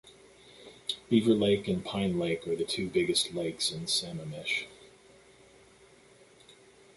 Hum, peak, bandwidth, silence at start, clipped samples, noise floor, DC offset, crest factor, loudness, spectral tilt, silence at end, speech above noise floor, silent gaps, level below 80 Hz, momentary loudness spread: none; -12 dBFS; 12 kHz; 0.05 s; under 0.1%; -58 dBFS; under 0.1%; 20 dB; -30 LUFS; -4 dB/octave; 2.1 s; 29 dB; none; -62 dBFS; 13 LU